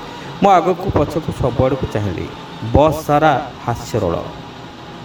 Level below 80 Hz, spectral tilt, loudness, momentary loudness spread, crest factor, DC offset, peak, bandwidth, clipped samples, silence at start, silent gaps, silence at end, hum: -34 dBFS; -7 dB/octave; -17 LUFS; 17 LU; 18 dB; under 0.1%; 0 dBFS; 19.5 kHz; under 0.1%; 0 s; none; 0 s; none